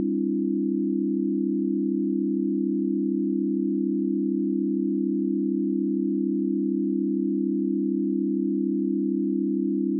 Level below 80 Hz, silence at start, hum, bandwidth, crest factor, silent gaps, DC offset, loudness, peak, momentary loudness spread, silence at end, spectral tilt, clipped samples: under -90 dBFS; 0 s; none; 0.4 kHz; 8 dB; none; under 0.1%; -25 LUFS; -16 dBFS; 0 LU; 0 s; -17 dB/octave; under 0.1%